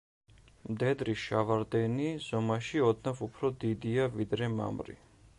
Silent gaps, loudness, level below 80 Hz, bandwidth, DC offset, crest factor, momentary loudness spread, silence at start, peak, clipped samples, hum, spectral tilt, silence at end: none; -32 LUFS; -60 dBFS; 11 kHz; under 0.1%; 18 dB; 8 LU; 0.65 s; -14 dBFS; under 0.1%; none; -7 dB/octave; 0.45 s